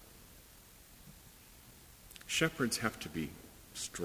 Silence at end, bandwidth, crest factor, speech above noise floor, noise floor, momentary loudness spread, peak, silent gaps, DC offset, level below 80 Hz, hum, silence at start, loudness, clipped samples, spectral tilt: 0 s; 16 kHz; 24 dB; 22 dB; -58 dBFS; 23 LU; -16 dBFS; none; under 0.1%; -62 dBFS; none; 0 s; -36 LUFS; under 0.1%; -3 dB/octave